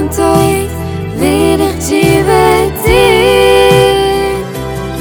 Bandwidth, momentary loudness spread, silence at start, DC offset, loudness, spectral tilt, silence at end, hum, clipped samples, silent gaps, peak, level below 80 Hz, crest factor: over 20 kHz; 12 LU; 0 s; under 0.1%; -10 LUFS; -5 dB/octave; 0 s; none; 1%; none; 0 dBFS; -26 dBFS; 10 dB